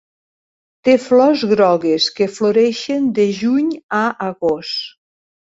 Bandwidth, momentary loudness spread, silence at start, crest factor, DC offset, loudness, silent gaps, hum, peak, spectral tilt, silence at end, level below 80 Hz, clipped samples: 8 kHz; 8 LU; 0.85 s; 14 dB; under 0.1%; -16 LUFS; 3.83-3.89 s; none; -2 dBFS; -5 dB/octave; 0.6 s; -60 dBFS; under 0.1%